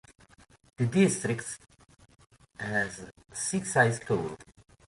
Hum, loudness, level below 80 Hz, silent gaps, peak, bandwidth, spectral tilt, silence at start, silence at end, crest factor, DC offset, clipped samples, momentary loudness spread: none; -29 LUFS; -62 dBFS; none; -10 dBFS; 11.5 kHz; -5 dB/octave; 0.8 s; 0.45 s; 22 dB; under 0.1%; under 0.1%; 17 LU